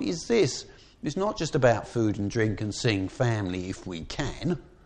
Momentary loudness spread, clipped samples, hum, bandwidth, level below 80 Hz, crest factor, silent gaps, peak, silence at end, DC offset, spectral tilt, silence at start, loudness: 12 LU; under 0.1%; none; 9.8 kHz; -48 dBFS; 20 dB; none; -8 dBFS; 0.15 s; under 0.1%; -5.5 dB/octave; 0 s; -28 LUFS